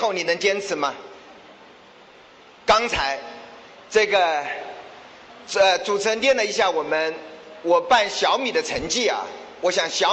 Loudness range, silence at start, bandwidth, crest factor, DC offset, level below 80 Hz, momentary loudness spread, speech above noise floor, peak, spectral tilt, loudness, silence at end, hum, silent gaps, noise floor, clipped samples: 4 LU; 0 s; 8.8 kHz; 16 dB; under 0.1%; -54 dBFS; 20 LU; 27 dB; -6 dBFS; -1.5 dB/octave; -21 LUFS; 0 s; none; none; -48 dBFS; under 0.1%